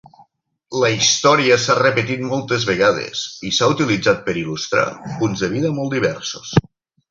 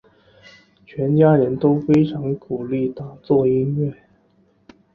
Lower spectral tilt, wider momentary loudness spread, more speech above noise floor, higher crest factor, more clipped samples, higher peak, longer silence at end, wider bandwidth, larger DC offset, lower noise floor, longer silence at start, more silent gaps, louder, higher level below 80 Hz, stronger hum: second, -4 dB/octave vs -10.5 dB/octave; second, 9 LU vs 12 LU; about the same, 40 dB vs 41 dB; about the same, 16 dB vs 18 dB; neither; about the same, -2 dBFS vs -2 dBFS; second, 0.5 s vs 1 s; first, 7.6 kHz vs 6.6 kHz; neither; about the same, -58 dBFS vs -59 dBFS; second, 0.7 s vs 0.95 s; neither; about the same, -18 LUFS vs -19 LUFS; about the same, -50 dBFS vs -54 dBFS; neither